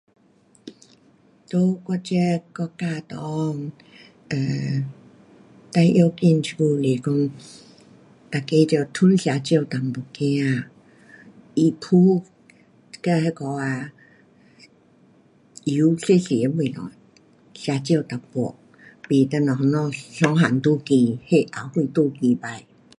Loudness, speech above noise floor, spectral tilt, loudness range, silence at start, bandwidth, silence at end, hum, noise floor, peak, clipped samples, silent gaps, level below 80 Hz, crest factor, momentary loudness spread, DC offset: -22 LUFS; 37 dB; -7 dB/octave; 6 LU; 0.65 s; 11 kHz; 0.4 s; none; -57 dBFS; -4 dBFS; under 0.1%; none; -64 dBFS; 20 dB; 12 LU; under 0.1%